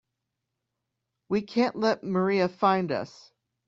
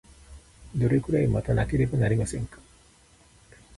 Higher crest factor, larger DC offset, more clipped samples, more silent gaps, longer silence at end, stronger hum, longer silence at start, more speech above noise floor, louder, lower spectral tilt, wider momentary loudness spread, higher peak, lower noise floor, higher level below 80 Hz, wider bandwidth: about the same, 20 dB vs 16 dB; neither; neither; neither; second, 0.6 s vs 1.25 s; neither; first, 1.3 s vs 0.3 s; first, 58 dB vs 33 dB; about the same, -26 LUFS vs -26 LUFS; about the same, -6.5 dB/octave vs -7.5 dB/octave; second, 7 LU vs 12 LU; about the same, -10 dBFS vs -10 dBFS; first, -84 dBFS vs -57 dBFS; second, -70 dBFS vs -42 dBFS; second, 7.4 kHz vs 11.5 kHz